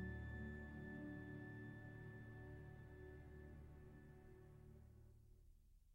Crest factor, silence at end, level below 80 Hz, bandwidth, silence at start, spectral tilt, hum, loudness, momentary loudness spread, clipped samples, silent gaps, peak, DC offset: 18 dB; 0 s; -64 dBFS; 16 kHz; 0 s; -8.5 dB/octave; none; -57 LUFS; 12 LU; under 0.1%; none; -40 dBFS; under 0.1%